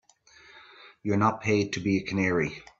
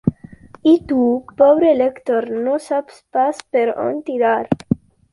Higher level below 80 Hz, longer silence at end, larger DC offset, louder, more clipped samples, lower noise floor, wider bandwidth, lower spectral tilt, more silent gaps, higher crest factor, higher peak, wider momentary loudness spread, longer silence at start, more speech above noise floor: second, -60 dBFS vs -50 dBFS; second, 0.2 s vs 0.35 s; neither; second, -27 LUFS vs -18 LUFS; neither; first, -56 dBFS vs -41 dBFS; second, 7.8 kHz vs 11.5 kHz; second, -6 dB/octave vs -7.5 dB/octave; neither; about the same, 20 dB vs 16 dB; second, -10 dBFS vs -2 dBFS; second, 5 LU vs 10 LU; first, 0.55 s vs 0.05 s; first, 30 dB vs 25 dB